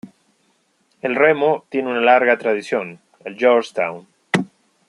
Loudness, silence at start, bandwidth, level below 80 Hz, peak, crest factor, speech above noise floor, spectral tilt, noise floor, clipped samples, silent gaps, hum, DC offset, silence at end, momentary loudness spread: -18 LUFS; 0.05 s; 11.5 kHz; -68 dBFS; -2 dBFS; 18 dB; 46 dB; -5.5 dB/octave; -63 dBFS; under 0.1%; none; none; under 0.1%; 0.4 s; 19 LU